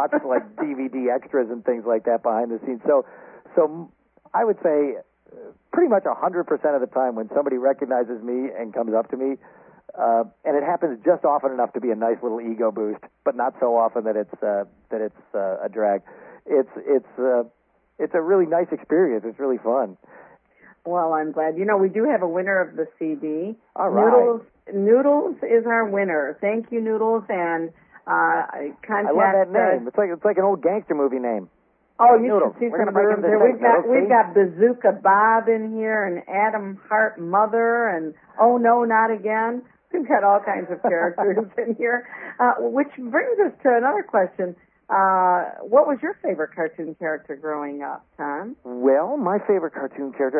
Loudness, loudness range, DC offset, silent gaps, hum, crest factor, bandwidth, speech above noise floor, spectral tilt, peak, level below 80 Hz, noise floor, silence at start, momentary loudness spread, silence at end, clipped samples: -21 LUFS; 6 LU; under 0.1%; none; none; 18 dB; 3.2 kHz; 33 dB; -12 dB/octave; -4 dBFS; -74 dBFS; -54 dBFS; 0 s; 12 LU; 0 s; under 0.1%